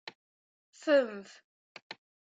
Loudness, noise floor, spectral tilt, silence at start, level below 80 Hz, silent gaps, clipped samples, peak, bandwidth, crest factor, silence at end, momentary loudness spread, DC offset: -30 LUFS; under -90 dBFS; -4 dB/octave; 0.05 s; -88 dBFS; 0.15-0.73 s, 1.44-1.75 s, 1.82-1.90 s; under 0.1%; -16 dBFS; 7.8 kHz; 20 dB; 0.45 s; 22 LU; under 0.1%